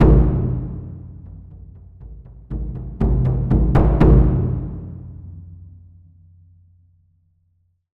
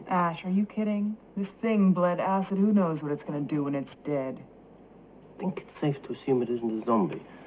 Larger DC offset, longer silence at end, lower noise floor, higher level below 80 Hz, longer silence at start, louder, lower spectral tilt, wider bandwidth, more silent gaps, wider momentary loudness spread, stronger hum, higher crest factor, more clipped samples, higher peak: neither; first, 2.4 s vs 0 s; first, -64 dBFS vs -52 dBFS; first, -22 dBFS vs -68 dBFS; about the same, 0 s vs 0 s; first, -18 LUFS vs -29 LUFS; first, -11 dB/octave vs -7.5 dB/octave; about the same, 4.1 kHz vs 4 kHz; neither; first, 27 LU vs 11 LU; neither; about the same, 18 dB vs 14 dB; neither; first, -2 dBFS vs -14 dBFS